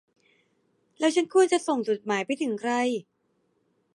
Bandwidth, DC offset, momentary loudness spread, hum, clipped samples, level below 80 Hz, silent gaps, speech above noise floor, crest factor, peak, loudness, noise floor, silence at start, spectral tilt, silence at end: 11.5 kHz; under 0.1%; 7 LU; none; under 0.1%; -82 dBFS; none; 47 dB; 18 dB; -10 dBFS; -26 LUFS; -72 dBFS; 1 s; -3.5 dB/octave; 0.95 s